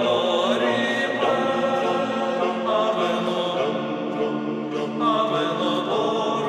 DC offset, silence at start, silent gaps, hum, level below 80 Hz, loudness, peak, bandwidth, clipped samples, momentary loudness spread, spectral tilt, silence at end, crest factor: under 0.1%; 0 s; none; none; -76 dBFS; -23 LUFS; -8 dBFS; 12.5 kHz; under 0.1%; 5 LU; -5 dB/octave; 0 s; 14 dB